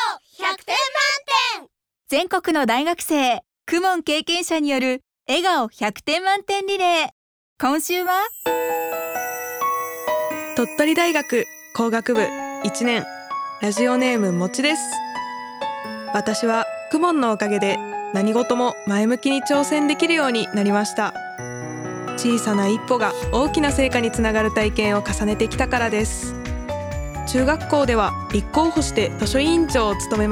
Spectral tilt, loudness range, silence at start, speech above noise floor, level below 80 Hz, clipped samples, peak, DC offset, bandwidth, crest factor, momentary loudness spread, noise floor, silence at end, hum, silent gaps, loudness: -4 dB/octave; 2 LU; 0 s; 30 dB; -38 dBFS; under 0.1%; -6 dBFS; under 0.1%; over 20 kHz; 16 dB; 9 LU; -50 dBFS; 0 s; none; 7.12-7.56 s; -21 LUFS